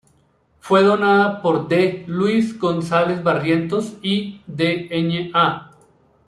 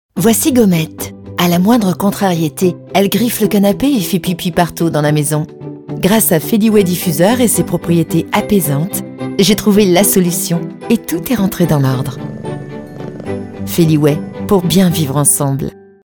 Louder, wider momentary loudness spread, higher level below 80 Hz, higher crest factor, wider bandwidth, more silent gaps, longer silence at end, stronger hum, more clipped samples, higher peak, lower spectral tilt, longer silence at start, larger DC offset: second, -19 LUFS vs -13 LUFS; second, 7 LU vs 13 LU; second, -58 dBFS vs -42 dBFS; about the same, 16 dB vs 14 dB; second, 12 kHz vs 19.5 kHz; neither; first, 0.65 s vs 0.35 s; neither; neither; about the same, -2 dBFS vs 0 dBFS; first, -6.5 dB/octave vs -5 dB/octave; first, 0.65 s vs 0.15 s; neither